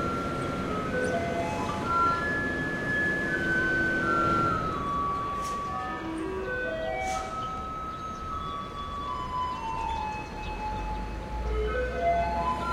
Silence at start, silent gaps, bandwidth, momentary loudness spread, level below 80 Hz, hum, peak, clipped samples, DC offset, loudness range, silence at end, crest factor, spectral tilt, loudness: 0 s; none; 15.5 kHz; 10 LU; -42 dBFS; none; -14 dBFS; under 0.1%; under 0.1%; 7 LU; 0 s; 16 dB; -5.5 dB/octave; -29 LUFS